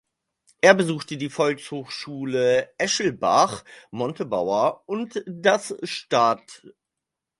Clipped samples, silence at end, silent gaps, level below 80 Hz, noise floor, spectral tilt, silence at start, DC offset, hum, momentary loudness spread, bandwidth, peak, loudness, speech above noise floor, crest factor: under 0.1%; 0.7 s; none; -66 dBFS; -85 dBFS; -4 dB/octave; 0.65 s; under 0.1%; none; 12 LU; 11.5 kHz; 0 dBFS; -23 LUFS; 62 dB; 22 dB